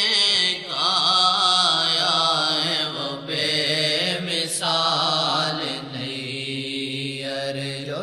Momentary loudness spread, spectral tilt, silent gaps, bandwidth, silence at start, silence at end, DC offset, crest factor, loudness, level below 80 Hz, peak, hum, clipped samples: 12 LU; -2.5 dB/octave; none; 13.5 kHz; 0 s; 0 s; under 0.1%; 18 dB; -20 LUFS; -70 dBFS; -4 dBFS; none; under 0.1%